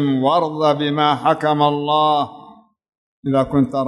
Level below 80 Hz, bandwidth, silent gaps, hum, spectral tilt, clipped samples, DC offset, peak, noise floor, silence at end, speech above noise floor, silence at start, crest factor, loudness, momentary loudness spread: -54 dBFS; 11 kHz; 2.98-3.23 s; none; -7 dB/octave; under 0.1%; under 0.1%; -2 dBFS; -45 dBFS; 0 s; 28 dB; 0 s; 14 dB; -17 LUFS; 5 LU